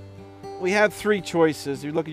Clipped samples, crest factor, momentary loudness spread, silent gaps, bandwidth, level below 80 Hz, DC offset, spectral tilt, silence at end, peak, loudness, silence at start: under 0.1%; 16 dB; 19 LU; none; 16 kHz; -60 dBFS; under 0.1%; -5 dB/octave; 0 s; -8 dBFS; -23 LUFS; 0 s